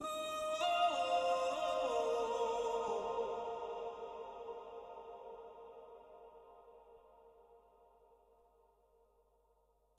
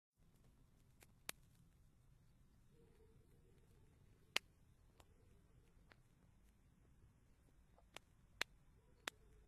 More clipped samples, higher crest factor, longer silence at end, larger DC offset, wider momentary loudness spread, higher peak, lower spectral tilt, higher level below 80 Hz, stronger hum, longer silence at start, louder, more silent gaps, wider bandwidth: neither; second, 18 dB vs 44 dB; first, 2.4 s vs 0 s; neither; first, 22 LU vs 17 LU; second, -22 dBFS vs -14 dBFS; about the same, -2 dB/octave vs -1.5 dB/octave; about the same, -74 dBFS vs -74 dBFS; neither; second, 0 s vs 0.15 s; first, -38 LUFS vs -50 LUFS; neither; about the same, 13.5 kHz vs 13 kHz